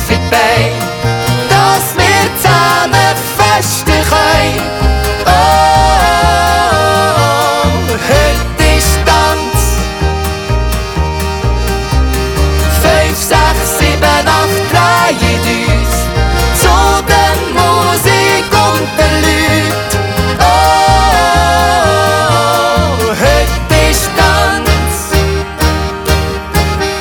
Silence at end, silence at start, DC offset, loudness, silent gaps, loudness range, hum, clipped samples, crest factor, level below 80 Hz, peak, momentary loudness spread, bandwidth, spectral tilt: 0 s; 0 s; under 0.1%; -10 LUFS; none; 3 LU; none; under 0.1%; 10 dB; -18 dBFS; 0 dBFS; 6 LU; over 20 kHz; -4 dB/octave